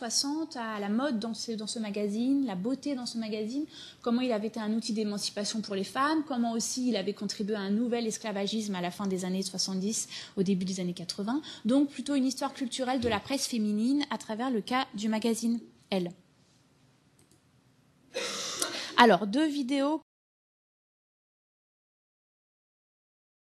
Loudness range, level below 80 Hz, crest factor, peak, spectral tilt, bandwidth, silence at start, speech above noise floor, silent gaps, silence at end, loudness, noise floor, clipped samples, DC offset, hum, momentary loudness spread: 6 LU; -74 dBFS; 28 dB; -4 dBFS; -4 dB/octave; 13 kHz; 0 s; 34 dB; none; 3.45 s; -31 LUFS; -65 dBFS; under 0.1%; under 0.1%; none; 6 LU